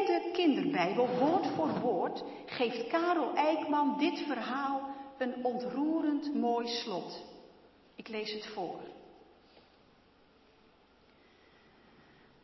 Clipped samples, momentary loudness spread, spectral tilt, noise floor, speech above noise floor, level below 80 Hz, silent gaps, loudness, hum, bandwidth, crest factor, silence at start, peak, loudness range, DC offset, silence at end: under 0.1%; 13 LU; -6 dB/octave; -64 dBFS; 32 dB; -76 dBFS; none; -33 LUFS; none; 6.2 kHz; 18 dB; 0 s; -16 dBFS; 13 LU; under 0.1%; 3.3 s